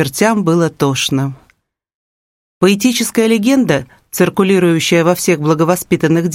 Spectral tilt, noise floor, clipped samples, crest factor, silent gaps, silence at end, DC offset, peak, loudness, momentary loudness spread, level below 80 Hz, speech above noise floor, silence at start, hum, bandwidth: -5 dB/octave; -58 dBFS; under 0.1%; 14 dB; 1.95-2.61 s; 0 s; under 0.1%; 0 dBFS; -13 LUFS; 4 LU; -52 dBFS; 45 dB; 0 s; none; 16.5 kHz